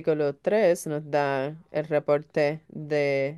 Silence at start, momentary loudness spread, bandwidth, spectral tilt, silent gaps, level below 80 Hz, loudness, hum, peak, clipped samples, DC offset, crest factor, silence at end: 0 s; 7 LU; 12.5 kHz; -6 dB/octave; none; -70 dBFS; -26 LUFS; none; -10 dBFS; under 0.1%; under 0.1%; 16 dB; 0 s